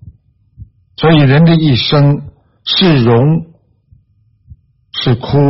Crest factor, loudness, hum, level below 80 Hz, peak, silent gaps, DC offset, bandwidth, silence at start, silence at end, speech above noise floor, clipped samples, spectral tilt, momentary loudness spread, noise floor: 12 dB; -10 LUFS; none; -40 dBFS; 0 dBFS; none; under 0.1%; 5.8 kHz; 0.05 s; 0 s; 44 dB; under 0.1%; -5.5 dB/octave; 10 LU; -53 dBFS